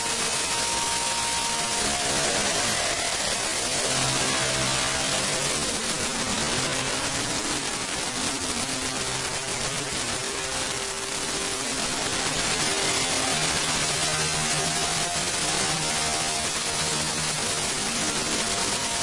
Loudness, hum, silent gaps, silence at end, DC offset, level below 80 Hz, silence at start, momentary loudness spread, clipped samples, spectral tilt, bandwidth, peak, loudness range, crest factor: -24 LUFS; none; none; 0 s; under 0.1%; -48 dBFS; 0 s; 4 LU; under 0.1%; -1.5 dB/octave; 12 kHz; -10 dBFS; 3 LU; 16 dB